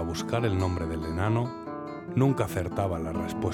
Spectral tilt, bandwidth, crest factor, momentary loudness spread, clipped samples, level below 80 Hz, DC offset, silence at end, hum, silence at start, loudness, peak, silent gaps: -7 dB/octave; 17.5 kHz; 16 dB; 8 LU; under 0.1%; -50 dBFS; under 0.1%; 0 s; none; 0 s; -29 LUFS; -12 dBFS; none